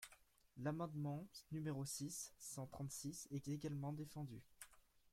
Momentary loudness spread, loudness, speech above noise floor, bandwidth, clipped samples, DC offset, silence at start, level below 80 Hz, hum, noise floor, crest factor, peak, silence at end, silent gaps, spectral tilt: 13 LU; -49 LUFS; 23 dB; 16.5 kHz; under 0.1%; under 0.1%; 0 s; -76 dBFS; none; -71 dBFS; 18 dB; -30 dBFS; 0.05 s; none; -5 dB/octave